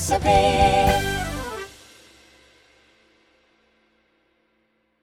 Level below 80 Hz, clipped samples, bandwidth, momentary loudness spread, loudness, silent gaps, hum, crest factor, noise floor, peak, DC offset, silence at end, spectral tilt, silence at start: -36 dBFS; under 0.1%; 17 kHz; 17 LU; -20 LUFS; none; none; 20 dB; -68 dBFS; -4 dBFS; under 0.1%; 3.35 s; -4.5 dB/octave; 0 s